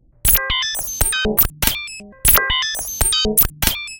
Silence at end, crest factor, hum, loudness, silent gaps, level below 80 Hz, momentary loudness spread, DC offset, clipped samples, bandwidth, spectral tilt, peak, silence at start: 0 s; 18 dB; none; -16 LUFS; none; -28 dBFS; 7 LU; under 0.1%; under 0.1%; 18 kHz; -1.5 dB/octave; 0 dBFS; 0.25 s